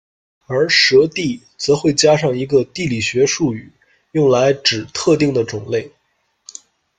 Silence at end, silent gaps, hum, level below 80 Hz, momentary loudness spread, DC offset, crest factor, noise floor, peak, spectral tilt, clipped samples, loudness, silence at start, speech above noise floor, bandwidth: 1.1 s; none; none; -52 dBFS; 11 LU; under 0.1%; 16 dB; -66 dBFS; 0 dBFS; -4 dB/octave; under 0.1%; -16 LUFS; 0.5 s; 50 dB; 9.4 kHz